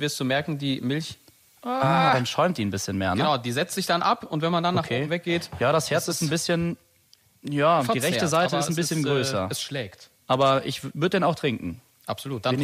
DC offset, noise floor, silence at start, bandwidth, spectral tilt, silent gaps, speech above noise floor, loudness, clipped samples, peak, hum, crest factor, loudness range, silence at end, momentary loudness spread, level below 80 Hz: under 0.1%; -60 dBFS; 0 s; 15.5 kHz; -4.5 dB/octave; none; 36 dB; -24 LUFS; under 0.1%; -8 dBFS; none; 16 dB; 2 LU; 0 s; 11 LU; -60 dBFS